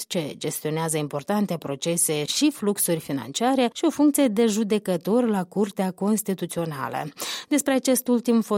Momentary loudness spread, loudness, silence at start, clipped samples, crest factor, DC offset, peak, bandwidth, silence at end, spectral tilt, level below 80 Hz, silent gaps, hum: 8 LU; -24 LUFS; 0 s; under 0.1%; 16 dB; under 0.1%; -8 dBFS; 16.5 kHz; 0 s; -4.5 dB/octave; -68 dBFS; none; none